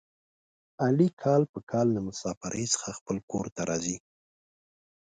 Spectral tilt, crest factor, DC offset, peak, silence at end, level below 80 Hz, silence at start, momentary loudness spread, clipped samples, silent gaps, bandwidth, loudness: -5 dB/octave; 20 dB; under 0.1%; -10 dBFS; 1.05 s; -62 dBFS; 0.8 s; 10 LU; under 0.1%; 1.13-1.17 s, 1.49-1.54 s, 1.63-1.67 s, 2.37-2.41 s, 3.01-3.06 s, 3.23-3.28 s, 3.52-3.56 s; 9.6 kHz; -29 LUFS